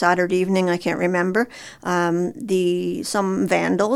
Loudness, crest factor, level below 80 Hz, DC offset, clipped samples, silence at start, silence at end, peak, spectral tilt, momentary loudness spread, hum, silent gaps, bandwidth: -21 LUFS; 18 dB; -60 dBFS; under 0.1%; under 0.1%; 0 s; 0 s; -2 dBFS; -5.5 dB/octave; 5 LU; none; none; 14.5 kHz